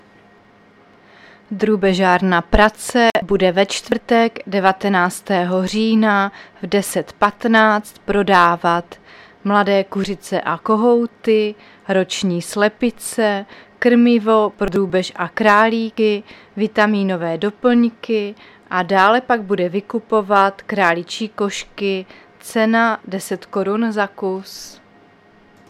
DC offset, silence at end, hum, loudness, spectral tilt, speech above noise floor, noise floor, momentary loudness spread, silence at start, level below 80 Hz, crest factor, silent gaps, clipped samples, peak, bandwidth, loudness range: under 0.1%; 0.95 s; none; -17 LUFS; -5 dB/octave; 33 dB; -49 dBFS; 10 LU; 1.5 s; -38 dBFS; 18 dB; none; under 0.1%; 0 dBFS; 15 kHz; 3 LU